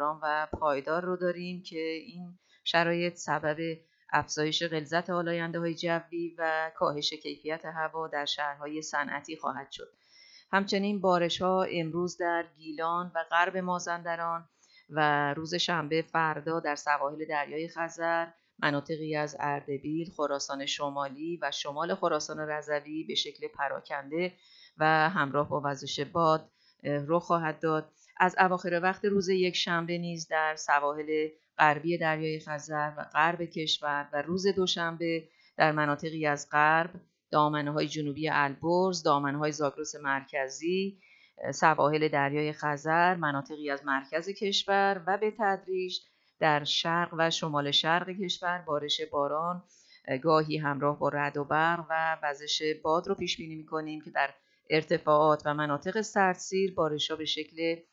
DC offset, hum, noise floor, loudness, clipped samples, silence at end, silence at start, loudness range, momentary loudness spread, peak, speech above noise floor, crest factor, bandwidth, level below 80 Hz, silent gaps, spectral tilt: under 0.1%; none; -58 dBFS; -30 LUFS; under 0.1%; 0.1 s; 0 s; 4 LU; 9 LU; -8 dBFS; 28 dB; 24 dB; 8 kHz; -70 dBFS; none; -4.5 dB/octave